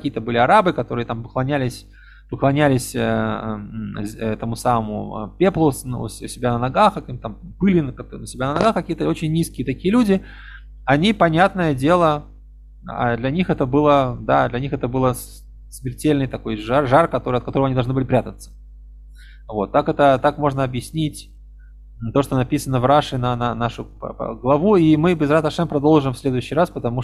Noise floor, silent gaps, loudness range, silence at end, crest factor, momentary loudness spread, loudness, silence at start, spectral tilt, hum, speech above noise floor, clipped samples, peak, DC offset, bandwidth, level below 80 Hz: -42 dBFS; none; 4 LU; 0 s; 18 dB; 14 LU; -19 LUFS; 0 s; -6.5 dB/octave; 50 Hz at -40 dBFS; 23 dB; under 0.1%; -2 dBFS; under 0.1%; 14.5 kHz; -40 dBFS